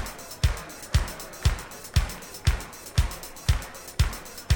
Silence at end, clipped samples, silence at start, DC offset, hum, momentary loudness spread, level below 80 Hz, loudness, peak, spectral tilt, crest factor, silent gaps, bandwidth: 0 s; under 0.1%; 0 s; under 0.1%; none; 7 LU; -30 dBFS; -29 LUFS; -10 dBFS; -4 dB/octave; 18 dB; none; 19 kHz